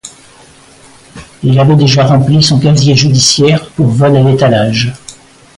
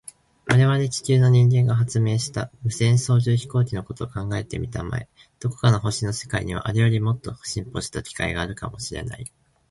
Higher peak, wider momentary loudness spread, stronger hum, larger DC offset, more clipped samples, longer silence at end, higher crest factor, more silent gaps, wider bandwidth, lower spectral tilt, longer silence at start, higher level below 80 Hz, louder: first, 0 dBFS vs -4 dBFS; second, 6 LU vs 13 LU; neither; neither; neither; about the same, 0.45 s vs 0.4 s; second, 10 dB vs 18 dB; neither; about the same, 11.5 kHz vs 11.5 kHz; about the same, -5.5 dB/octave vs -6 dB/octave; second, 0.05 s vs 0.45 s; about the same, -40 dBFS vs -44 dBFS; first, -8 LUFS vs -23 LUFS